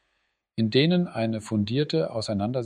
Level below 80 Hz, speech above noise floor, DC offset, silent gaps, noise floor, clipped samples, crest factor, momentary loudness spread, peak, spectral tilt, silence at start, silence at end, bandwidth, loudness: -64 dBFS; 50 dB; under 0.1%; none; -75 dBFS; under 0.1%; 18 dB; 7 LU; -8 dBFS; -6.5 dB/octave; 0.55 s; 0 s; 10.5 kHz; -25 LUFS